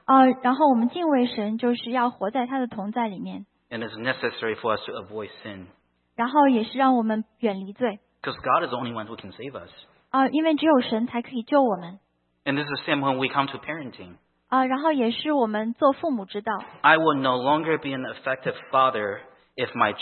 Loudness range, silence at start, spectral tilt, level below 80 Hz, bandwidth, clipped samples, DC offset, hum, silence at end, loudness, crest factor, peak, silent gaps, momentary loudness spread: 5 LU; 0.1 s; -10 dB/octave; -70 dBFS; 4.4 kHz; under 0.1%; under 0.1%; none; 0 s; -24 LUFS; 22 dB; -2 dBFS; none; 16 LU